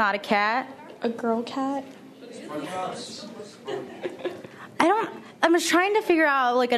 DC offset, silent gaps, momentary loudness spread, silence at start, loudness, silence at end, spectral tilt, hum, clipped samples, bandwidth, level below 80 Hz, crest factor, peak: under 0.1%; none; 20 LU; 0 s; -25 LUFS; 0 s; -3.5 dB/octave; none; under 0.1%; 13.5 kHz; -74 dBFS; 22 dB; -2 dBFS